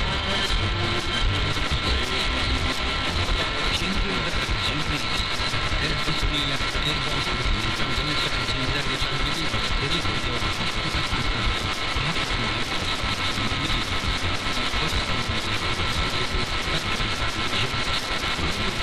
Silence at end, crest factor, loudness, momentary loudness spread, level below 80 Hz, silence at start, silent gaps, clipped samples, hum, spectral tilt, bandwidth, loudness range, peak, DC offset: 0 s; 12 dB; -24 LUFS; 2 LU; -32 dBFS; 0 s; none; under 0.1%; none; -3.5 dB/octave; 14.5 kHz; 1 LU; -12 dBFS; 1%